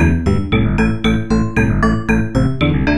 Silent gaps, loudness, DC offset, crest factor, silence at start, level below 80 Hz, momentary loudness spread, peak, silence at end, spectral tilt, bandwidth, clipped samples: none; -16 LUFS; 4%; 14 dB; 0 s; -24 dBFS; 2 LU; 0 dBFS; 0 s; -7.5 dB/octave; 11 kHz; under 0.1%